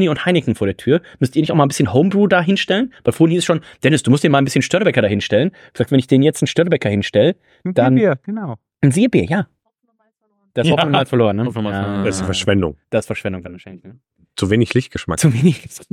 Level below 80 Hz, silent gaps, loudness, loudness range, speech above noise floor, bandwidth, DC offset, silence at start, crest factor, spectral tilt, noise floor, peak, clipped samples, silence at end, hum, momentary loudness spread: -48 dBFS; none; -16 LUFS; 4 LU; 50 dB; 15 kHz; under 0.1%; 0 s; 14 dB; -6 dB/octave; -66 dBFS; -2 dBFS; under 0.1%; 0.1 s; none; 10 LU